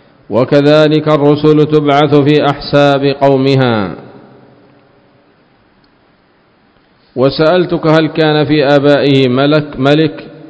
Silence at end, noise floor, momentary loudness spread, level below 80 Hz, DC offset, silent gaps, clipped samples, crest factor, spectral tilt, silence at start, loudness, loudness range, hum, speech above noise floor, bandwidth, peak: 0.1 s; -50 dBFS; 6 LU; -46 dBFS; under 0.1%; none; 0.8%; 10 dB; -8 dB/octave; 0.3 s; -10 LUFS; 9 LU; none; 41 dB; 8 kHz; 0 dBFS